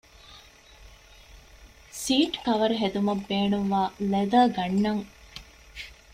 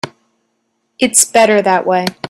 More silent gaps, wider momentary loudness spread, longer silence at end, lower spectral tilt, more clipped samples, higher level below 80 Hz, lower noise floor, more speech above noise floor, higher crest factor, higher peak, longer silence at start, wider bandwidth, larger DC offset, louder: neither; first, 21 LU vs 8 LU; first, 0.2 s vs 0 s; first, -5 dB/octave vs -2.5 dB/octave; neither; about the same, -54 dBFS vs -56 dBFS; second, -51 dBFS vs -66 dBFS; second, 27 dB vs 54 dB; about the same, 18 dB vs 14 dB; second, -8 dBFS vs 0 dBFS; first, 0.3 s vs 0.05 s; about the same, 15.5 kHz vs 16 kHz; neither; second, -25 LUFS vs -11 LUFS